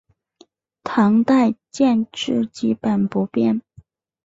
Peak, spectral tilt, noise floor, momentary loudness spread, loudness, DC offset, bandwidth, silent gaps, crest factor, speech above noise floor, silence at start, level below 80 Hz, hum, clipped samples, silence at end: -6 dBFS; -6.5 dB/octave; -55 dBFS; 7 LU; -19 LUFS; under 0.1%; 7.8 kHz; none; 14 dB; 37 dB; 0.85 s; -60 dBFS; none; under 0.1%; 0.65 s